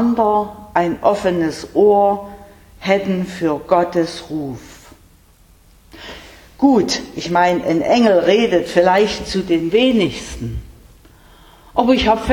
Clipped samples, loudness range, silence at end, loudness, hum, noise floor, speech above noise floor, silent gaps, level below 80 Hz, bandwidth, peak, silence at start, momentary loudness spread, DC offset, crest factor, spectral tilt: under 0.1%; 7 LU; 0 s; -16 LUFS; none; -49 dBFS; 34 dB; none; -42 dBFS; 18.5 kHz; 0 dBFS; 0 s; 15 LU; under 0.1%; 16 dB; -5.5 dB/octave